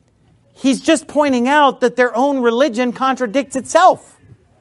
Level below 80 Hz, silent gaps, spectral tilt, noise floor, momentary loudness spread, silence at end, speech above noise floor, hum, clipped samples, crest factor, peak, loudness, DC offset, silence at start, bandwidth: -60 dBFS; none; -3.5 dB/octave; -54 dBFS; 7 LU; 0.65 s; 39 dB; none; under 0.1%; 16 dB; 0 dBFS; -15 LUFS; under 0.1%; 0.65 s; 11.5 kHz